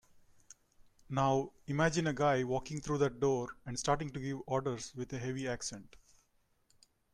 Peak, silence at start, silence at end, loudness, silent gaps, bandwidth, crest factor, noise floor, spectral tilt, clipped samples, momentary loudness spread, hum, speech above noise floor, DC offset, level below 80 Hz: -16 dBFS; 0.15 s; 1.15 s; -35 LUFS; none; 12 kHz; 20 dB; -74 dBFS; -5.5 dB/octave; under 0.1%; 10 LU; none; 40 dB; under 0.1%; -60 dBFS